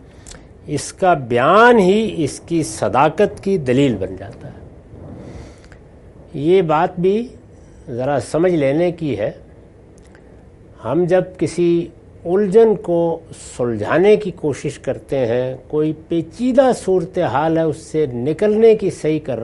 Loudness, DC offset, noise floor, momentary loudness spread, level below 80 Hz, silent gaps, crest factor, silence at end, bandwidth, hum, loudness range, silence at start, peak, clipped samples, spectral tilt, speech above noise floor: -17 LUFS; under 0.1%; -43 dBFS; 18 LU; -46 dBFS; none; 18 dB; 0 s; 11.5 kHz; none; 6 LU; 0.25 s; 0 dBFS; under 0.1%; -6.5 dB/octave; 27 dB